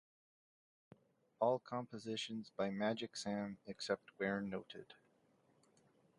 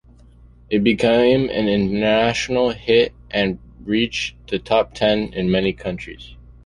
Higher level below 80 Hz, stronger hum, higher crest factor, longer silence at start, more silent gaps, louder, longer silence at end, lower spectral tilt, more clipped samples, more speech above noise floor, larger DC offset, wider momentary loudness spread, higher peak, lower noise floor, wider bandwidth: second, -80 dBFS vs -42 dBFS; second, none vs 60 Hz at -45 dBFS; about the same, 22 dB vs 18 dB; first, 1.4 s vs 0.7 s; neither; second, -42 LUFS vs -19 LUFS; first, 1.25 s vs 0.3 s; about the same, -5 dB/octave vs -5.5 dB/octave; neither; first, 33 dB vs 28 dB; neither; about the same, 10 LU vs 12 LU; second, -22 dBFS vs -2 dBFS; first, -75 dBFS vs -47 dBFS; about the same, 11 kHz vs 11.5 kHz